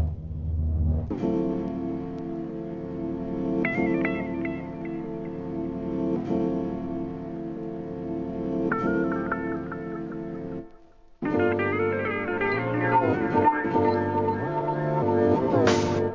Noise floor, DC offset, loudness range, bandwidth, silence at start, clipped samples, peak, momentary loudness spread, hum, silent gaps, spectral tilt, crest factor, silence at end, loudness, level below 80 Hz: -51 dBFS; 0.1%; 6 LU; 7.6 kHz; 0 s; under 0.1%; -8 dBFS; 12 LU; none; none; -7.5 dB/octave; 18 dB; 0 s; -27 LUFS; -40 dBFS